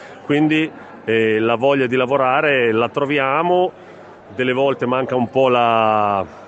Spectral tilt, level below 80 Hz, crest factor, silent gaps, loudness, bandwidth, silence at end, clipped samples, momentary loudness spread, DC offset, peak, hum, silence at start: -7 dB/octave; -62 dBFS; 14 dB; none; -17 LUFS; 8.2 kHz; 0 s; under 0.1%; 6 LU; under 0.1%; -2 dBFS; none; 0 s